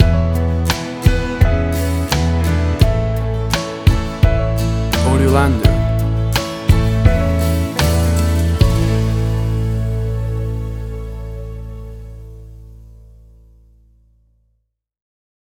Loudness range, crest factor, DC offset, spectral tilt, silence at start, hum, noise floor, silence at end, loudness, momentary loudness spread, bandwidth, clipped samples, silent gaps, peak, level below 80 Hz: 13 LU; 16 dB; under 0.1%; -6 dB/octave; 0 s; none; -68 dBFS; 2.6 s; -16 LUFS; 14 LU; 20 kHz; under 0.1%; none; 0 dBFS; -22 dBFS